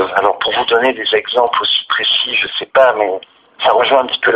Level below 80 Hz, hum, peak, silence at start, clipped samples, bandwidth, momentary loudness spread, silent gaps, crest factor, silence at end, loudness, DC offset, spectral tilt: -58 dBFS; none; 0 dBFS; 0 s; under 0.1%; 6.6 kHz; 5 LU; none; 14 dB; 0 s; -13 LUFS; under 0.1%; -4 dB/octave